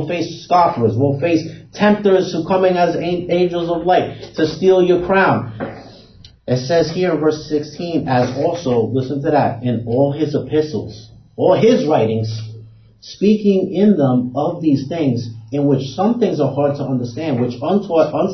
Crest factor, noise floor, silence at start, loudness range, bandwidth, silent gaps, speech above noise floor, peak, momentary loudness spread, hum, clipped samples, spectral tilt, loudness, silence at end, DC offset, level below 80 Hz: 16 dB; -43 dBFS; 0 s; 3 LU; 6.4 kHz; none; 27 dB; 0 dBFS; 9 LU; none; under 0.1%; -7 dB/octave; -17 LUFS; 0 s; under 0.1%; -50 dBFS